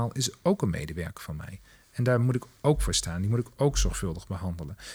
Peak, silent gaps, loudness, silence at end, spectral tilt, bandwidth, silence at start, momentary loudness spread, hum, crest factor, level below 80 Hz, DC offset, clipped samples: -10 dBFS; none; -28 LUFS; 0 s; -5 dB/octave; over 20 kHz; 0 s; 14 LU; none; 18 dB; -38 dBFS; under 0.1%; under 0.1%